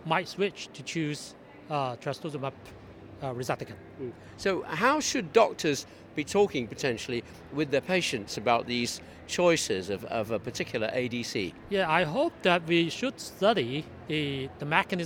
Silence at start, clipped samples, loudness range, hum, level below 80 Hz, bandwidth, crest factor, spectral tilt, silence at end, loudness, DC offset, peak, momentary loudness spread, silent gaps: 0 s; under 0.1%; 7 LU; none; -60 dBFS; 18.5 kHz; 22 dB; -4 dB/octave; 0 s; -29 LUFS; under 0.1%; -6 dBFS; 13 LU; none